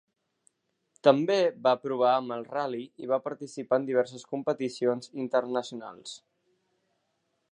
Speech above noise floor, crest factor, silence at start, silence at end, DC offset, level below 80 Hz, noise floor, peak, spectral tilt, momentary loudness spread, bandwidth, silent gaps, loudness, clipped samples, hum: 49 dB; 24 dB; 1.05 s; 1.35 s; under 0.1%; -84 dBFS; -77 dBFS; -6 dBFS; -5.5 dB/octave; 16 LU; 10.5 kHz; none; -28 LUFS; under 0.1%; none